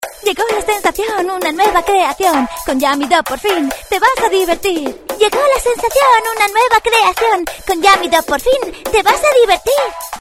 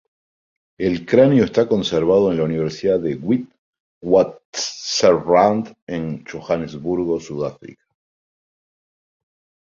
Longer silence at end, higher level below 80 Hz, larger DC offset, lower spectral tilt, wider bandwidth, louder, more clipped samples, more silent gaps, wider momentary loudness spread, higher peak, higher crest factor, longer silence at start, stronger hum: second, 0 s vs 1.9 s; first, -38 dBFS vs -52 dBFS; neither; second, -2 dB/octave vs -5.5 dB/octave; first, 17.5 kHz vs 7.6 kHz; first, -13 LUFS vs -19 LUFS; neither; second, none vs 3.58-3.73 s, 3.80-4.01 s, 4.45-4.53 s, 5.82-5.87 s; second, 7 LU vs 13 LU; about the same, 0 dBFS vs -2 dBFS; about the same, 14 dB vs 18 dB; second, 0 s vs 0.8 s; neither